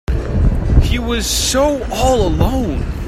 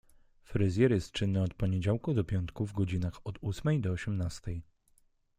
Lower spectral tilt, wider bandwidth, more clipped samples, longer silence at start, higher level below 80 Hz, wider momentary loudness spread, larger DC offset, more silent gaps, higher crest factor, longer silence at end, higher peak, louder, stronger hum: second, -5 dB/octave vs -7.5 dB/octave; first, 15.5 kHz vs 10 kHz; neither; second, 0.1 s vs 0.5 s; first, -18 dBFS vs -52 dBFS; second, 4 LU vs 10 LU; neither; neither; second, 14 dB vs 20 dB; second, 0 s vs 0.75 s; first, 0 dBFS vs -12 dBFS; first, -16 LUFS vs -32 LUFS; neither